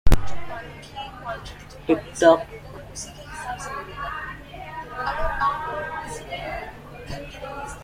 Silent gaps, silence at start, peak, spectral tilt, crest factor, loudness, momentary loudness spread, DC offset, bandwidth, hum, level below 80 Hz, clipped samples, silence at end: none; 0.05 s; -2 dBFS; -5 dB/octave; 22 dB; -27 LUFS; 16 LU; under 0.1%; 16 kHz; none; -32 dBFS; under 0.1%; 0 s